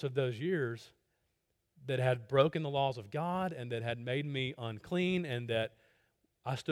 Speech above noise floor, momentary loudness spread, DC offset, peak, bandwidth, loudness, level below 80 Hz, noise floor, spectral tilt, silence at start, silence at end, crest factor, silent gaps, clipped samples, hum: 47 dB; 10 LU; under 0.1%; -14 dBFS; 13 kHz; -35 LUFS; -72 dBFS; -81 dBFS; -7 dB/octave; 0 s; 0 s; 20 dB; none; under 0.1%; none